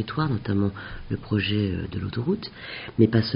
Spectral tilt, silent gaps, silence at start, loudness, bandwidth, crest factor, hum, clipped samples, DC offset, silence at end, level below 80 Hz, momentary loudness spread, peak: -6 dB/octave; none; 0 s; -26 LUFS; 5.4 kHz; 20 dB; none; under 0.1%; under 0.1%; 0 s; -46 dBFS; 12 LU; -4 dBFS